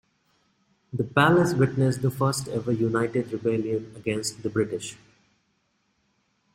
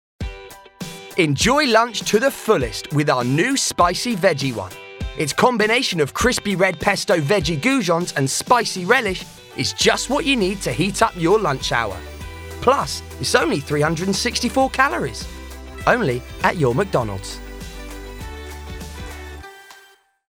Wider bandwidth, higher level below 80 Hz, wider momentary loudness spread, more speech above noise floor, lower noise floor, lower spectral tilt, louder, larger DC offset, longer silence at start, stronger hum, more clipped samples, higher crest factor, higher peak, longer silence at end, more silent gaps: second, 16 kHz vs over 20 kHz; second, -60 dBFS vs -40 dBFS; second, 11 LU vs 17 LU; first, 47 dB vs 33 dB; first, -71 dBFS vs -51 dBFS; first, -6 dB/octave vs -4 dB/octave; second, -25 LUFS vs -19 LUFS; neither; first, 0.95 s vs 0.2 s; neither; neither; about the same, 20 dB vs 20 dB; second, -6 dBFS vs 0 dBFS; first, 1.6 s vs 0.5 s; neither